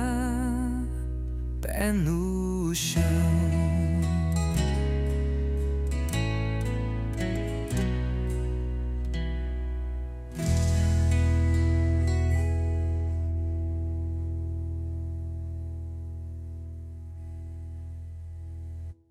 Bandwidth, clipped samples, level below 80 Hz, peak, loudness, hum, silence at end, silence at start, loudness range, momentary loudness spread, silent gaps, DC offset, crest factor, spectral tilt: 15 kHz; under 0.1%; -32 dBFS; -12 dBFS; -28 LUFS; none; 0.15 s; 0 s; 10 LU; 15 LU; none; under 0.1%; 16 dB; -6.5 dB/octave